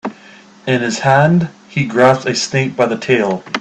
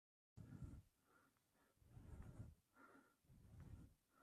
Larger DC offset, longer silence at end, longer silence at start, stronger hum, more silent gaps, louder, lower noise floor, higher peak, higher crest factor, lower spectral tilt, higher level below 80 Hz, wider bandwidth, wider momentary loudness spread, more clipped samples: neither; about the same, 0 s vs 0 s; second, 0.05 s vs 0.35 s; neither; neither; first, -14 LUFS vs -63 LUFS; second, -41 dBFS vs -82 dBFS; first, 0 dBFS vs -44 dBFS; second, 14 dB vs 20 dB; second, -5.5 dB/octave vs -7.5 dB/octave; first, -54 dBFS vs -70 dBFS; second, 9 kHz vs 13.5 kHz; about the same, 9 LU vs 7 LU; neither